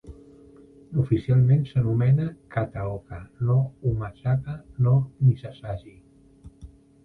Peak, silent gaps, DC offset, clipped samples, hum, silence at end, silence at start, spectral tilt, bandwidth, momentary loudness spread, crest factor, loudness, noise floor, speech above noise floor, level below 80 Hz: -8 dBFS; none; under 0.1%; under 0.1%; none; 0.4 s; 0.05 s; -10.5 dB/octave; 4.1 kHz; 15 LU; 16 dB; -24 LUFS; -50 dBFS; 27 dB; -48 dBFS